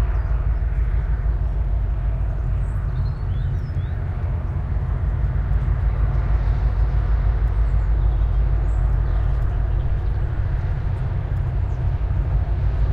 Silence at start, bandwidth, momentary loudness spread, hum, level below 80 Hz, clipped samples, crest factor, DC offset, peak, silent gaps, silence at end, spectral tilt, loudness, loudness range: 0 s; 4.1 kHz; 3 LU; none; -22 dBFS; under 0.1%; 10 dB; under 0.1%; -8 dBFS; none; 0 s; -9.5 dB/octave; -23 LUFS; 3 LU